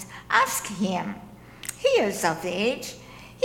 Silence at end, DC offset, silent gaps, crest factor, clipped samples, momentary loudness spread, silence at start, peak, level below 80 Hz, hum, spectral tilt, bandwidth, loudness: 0 s; under 0.1%; none; 22 dB; under 0.1%; 16 LU; 0 s; -6 dBFS; -58 dBFS; 60 Hz at -50 dBFS; -3.5 dB/octave; 18.5 kHz; -25 LUFS